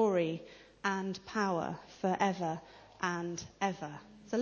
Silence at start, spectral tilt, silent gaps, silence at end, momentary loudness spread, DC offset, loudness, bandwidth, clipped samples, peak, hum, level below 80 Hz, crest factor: 0 s; -5.5 dB/octave; none; 0 s; 12 LU; under 0.1%; -36 LUFS; 7.2 kHz; under 0.1%; -14 dBFS; none; -68 dBFS; 20 dB